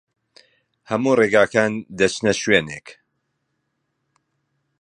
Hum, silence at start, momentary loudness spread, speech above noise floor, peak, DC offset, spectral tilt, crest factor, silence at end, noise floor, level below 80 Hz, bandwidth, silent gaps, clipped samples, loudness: none; 0.9 s; 11 LU; 55 dB; 0 dBFS; under 0.1%; -4.5 dB/octave; 22 dB; 1.9 s; -74 dBFS; -56 dBFS; 11 kHz; none; under 0.1%; -19 LUFS